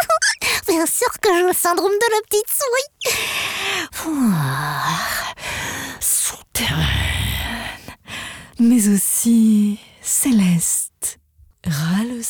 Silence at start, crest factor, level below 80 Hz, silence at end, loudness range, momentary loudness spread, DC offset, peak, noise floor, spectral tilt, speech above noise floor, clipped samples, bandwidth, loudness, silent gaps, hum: 0 s; 14 dB; -38 dBFS; 0 s; 4 LU; 11 LU; under 0.1%; -6 dBFS; -53 dBFS; -3.5 dB/octave; 35 dB; under 0.1%; over 20 kHz; -18 LUFS; none; none